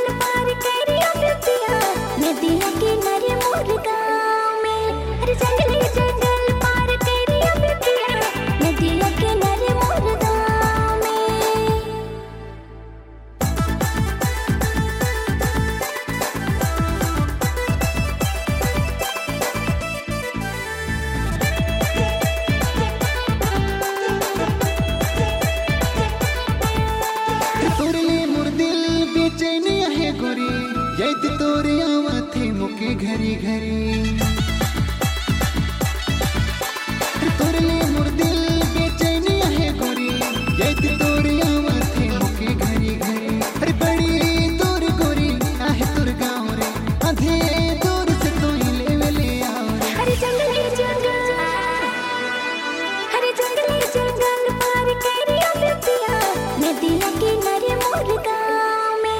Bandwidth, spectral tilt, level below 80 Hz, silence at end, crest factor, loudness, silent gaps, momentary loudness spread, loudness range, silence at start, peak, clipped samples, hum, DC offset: 17 kHz; -5 dB/octave; -30 dBFS; 0 s; 12 dB; -20 LUFS; none; 5 LU; 3 LU; 0 s; -6 dBFS; under 0.1%; none; under 0.1%